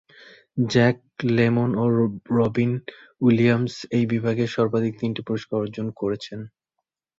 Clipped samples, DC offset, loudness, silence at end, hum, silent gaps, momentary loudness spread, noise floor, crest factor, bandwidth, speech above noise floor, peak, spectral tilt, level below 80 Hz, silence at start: under 0.1%; under 0.1%; -23 LUFS; 0.7 s; none; none; 12 LU; -82 dBFS; 18 dB; 7.6 kHz; 60 dB; -6 dBFS; -7.5 dB/octave; -58 dBFS; 0.55 s